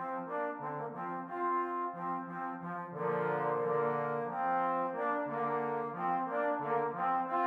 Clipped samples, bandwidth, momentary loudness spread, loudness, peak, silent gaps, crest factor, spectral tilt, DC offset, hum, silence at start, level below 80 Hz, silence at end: under 0.1%; 5.2 kHz; 7 LU; -35 LUFS; -20 dBFS; none; 14 dB; -9 dB/octave; under 0.1%; none; 0 s; -88 dBFS; 0 s